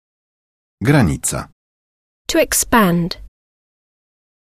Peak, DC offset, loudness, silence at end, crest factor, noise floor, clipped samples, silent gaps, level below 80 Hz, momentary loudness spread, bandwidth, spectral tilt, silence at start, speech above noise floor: -2 dBFS; under 0.1%; -16 LUFS; 1.25 s; 18 dB; under -90 dBFS; under 0.1%; 1.52-2.25 s; -38 dBFS; 17 LU; 14 kHz; -4.5 dB/octave; 0.8 s; over 75 dB